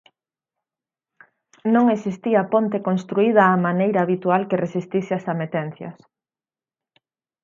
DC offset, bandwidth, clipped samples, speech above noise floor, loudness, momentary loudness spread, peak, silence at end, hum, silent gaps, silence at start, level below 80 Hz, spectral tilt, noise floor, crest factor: under 0.1%; 7.4 kHz; under 0.1%; over 70 dB; -20 LUFS; 11 LU; -2 dBFS; 1.5 s; none; none; 1.65 s; -72 dBFS; -8.5 dB/octave; under -90 dBFS; 20 dB